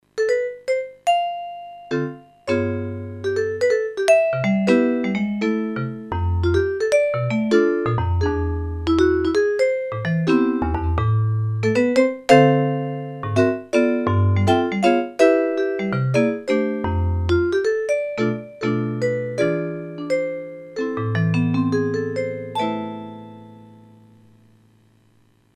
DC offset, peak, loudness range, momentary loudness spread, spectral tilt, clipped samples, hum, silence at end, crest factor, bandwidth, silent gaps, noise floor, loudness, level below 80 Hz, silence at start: under 0.1%; 0 dBFS; 6 LU; 10 LU; -7 dB/octave; under 0.1%; 50 Hz at -50 dBFS; 1.95 s; 20 dB; 11.5 kHz; none; -58 dBFS; -20 LUFS; -38 dBFS; 0.15 s